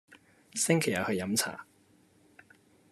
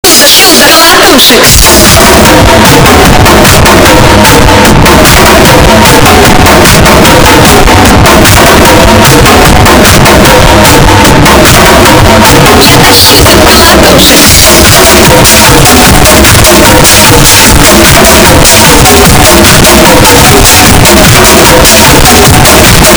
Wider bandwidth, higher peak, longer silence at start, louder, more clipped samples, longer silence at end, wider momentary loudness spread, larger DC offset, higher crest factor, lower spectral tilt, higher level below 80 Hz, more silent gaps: second, 13.5 kHz vs over 20 kHz; second, -10 dBFS vs 0 dBFS; about the same, 0.1 s vs 0.05 s; second, -30 LUFS vs 0 LUFS; second, under 0.1% vs 90%; first, 1.3 s vs 0 s; first, 12 LU vs 2 LU; neither; first, 24 dB vs 0 dB; about the same, -3.5 dB/octave vs -3 dB/octave; second, -74 dBFS vs -12 dBFS; neither